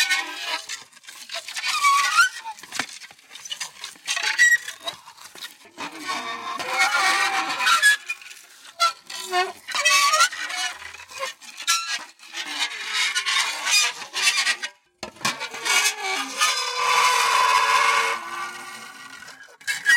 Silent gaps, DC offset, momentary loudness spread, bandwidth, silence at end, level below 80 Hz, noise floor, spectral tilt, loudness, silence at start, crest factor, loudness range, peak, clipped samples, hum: none; under 0.1%; 20 LU; 16.5 kHz; 0 s; -76 dBFS; -45 dBFS; 2 dB/octave; -21 LUFS; 0 s; 18 dB; 4 LU; -6 dBFS; under 0.1%; none